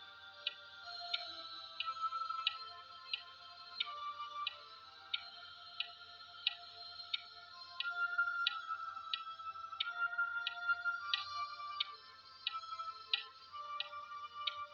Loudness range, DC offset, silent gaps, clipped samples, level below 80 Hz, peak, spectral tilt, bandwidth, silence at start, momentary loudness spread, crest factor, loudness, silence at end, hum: 5 LU; under 0.1%; none; under 0.1%; -88 dBFS; -16 dBFS; 0 dB/octave; 7.4 kHz; 0 s; 14 LU; 26 dB; -41 LUFS; 0 s; none